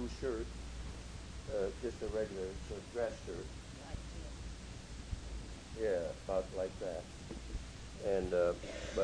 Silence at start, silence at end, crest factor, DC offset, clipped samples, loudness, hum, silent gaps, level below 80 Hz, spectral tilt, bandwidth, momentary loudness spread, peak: 0 s; 0 s; 18 dB; under 0.1%; under 0.1%; -41 LUFS; none; none; -50 dBFS; -5.5 dB/octave; 10.5 kHz; 12 LU; -22 dBFS